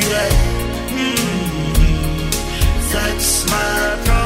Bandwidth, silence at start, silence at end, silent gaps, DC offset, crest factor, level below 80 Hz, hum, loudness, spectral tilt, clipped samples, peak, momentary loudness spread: 16.5 kHz; 0 s; 0 s; none; under 0.1%; 16 dB; -20 dBFS; none; -17 LUFS; -3.5 dB/octave; under 0.1%; 0 dBFS; 5 LU